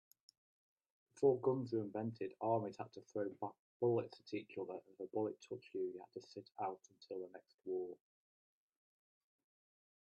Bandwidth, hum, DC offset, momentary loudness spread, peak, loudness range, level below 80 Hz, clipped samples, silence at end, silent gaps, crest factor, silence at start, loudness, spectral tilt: 9.6 kHz; none; under 0.1%; 16 LU; -22 dBFS; 10 LU; -88 dBFS; under 0.1%; 2.2 s; 3.59-3.80 s, 7.54-7.58 s; 22 dB; 1.15 s; -43 LUFS; -8 dB/octave